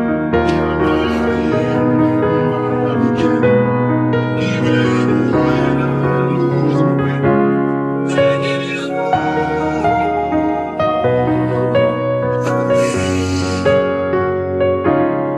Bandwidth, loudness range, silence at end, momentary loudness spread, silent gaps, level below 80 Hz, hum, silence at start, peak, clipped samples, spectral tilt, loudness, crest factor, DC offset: 11.5 kHz; 2 LU; 0 s; 3 LU; none; -40 dBFS; none; 0 s; -2 dBFS; under 0.1%; -7 dB/octave; -15 LUFS; 12 dB; 0.1%